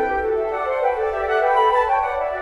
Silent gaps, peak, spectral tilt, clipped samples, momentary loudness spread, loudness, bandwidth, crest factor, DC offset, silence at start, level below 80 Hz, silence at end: none; -6 dBFS; -5 dB/octave; under 0.1%; 6 LU; -20 LUFS; 11.5 kHz; 14 dB; under 0.1%; 0 s; -44 dBFS; 0 s